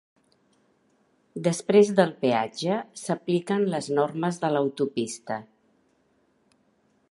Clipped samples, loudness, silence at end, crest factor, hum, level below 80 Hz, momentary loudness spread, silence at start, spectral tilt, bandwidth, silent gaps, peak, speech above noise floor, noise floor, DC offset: under 0.1%; -25 LUFS; 1.7 s; 22 dB; none; -76 dBFS; 11 LU; 1.35 s; -5.5 dB/octave; 11.5 kHz; none; -4 dBFS; 42 dB; -67 dBFS; under 0.1%